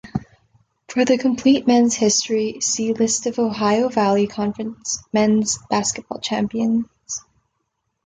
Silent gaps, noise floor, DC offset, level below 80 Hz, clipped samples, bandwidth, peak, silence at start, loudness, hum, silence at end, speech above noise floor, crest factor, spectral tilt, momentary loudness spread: none; -74 dBFS; under 0.1%; -54 dBFS; under 0.1%; 9.6 kHz; -4 dBFS; 0.05 s; -19 LUFS; none; 0.85 s; 55 dB; 16 dB; -3.5 dB/octave; 11 LU